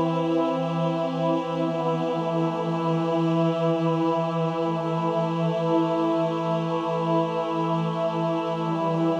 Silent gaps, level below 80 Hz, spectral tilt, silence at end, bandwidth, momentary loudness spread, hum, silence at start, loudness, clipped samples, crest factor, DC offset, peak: none; -70 dBFS; -8 dB/octave; 0 s; 7.8 kHz; 3 LU; none; 0 s; -25 LUFS; under 0.1%; 12 dB; under 0.1%; -12 dBFS